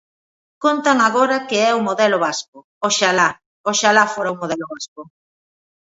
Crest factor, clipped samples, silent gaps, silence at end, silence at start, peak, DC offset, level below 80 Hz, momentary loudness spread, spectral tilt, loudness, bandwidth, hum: 18 dB; under 0.1%; 2.48-2.53 s, 2.64-2.81 s, 3.46-3.64 s, 4.88-4.96 s; 0.9 s; 0.6 s; 0 dBFS; under 0.1%; -68 dBFS; 12 LU; -2.5 dB/octave; -17 LUFS; 8 kHz; none